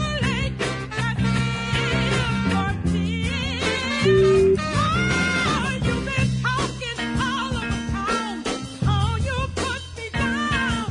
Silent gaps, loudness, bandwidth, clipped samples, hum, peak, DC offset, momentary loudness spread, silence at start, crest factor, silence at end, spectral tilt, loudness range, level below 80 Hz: none; -22 LUFS; 11 kHz; under 0.1%; none; -6 dBFS; under 0.1%; 7 LU; 0 s; 16 dB; 0 s; -5.5 dB/octave; 4 LU; -36 dBFS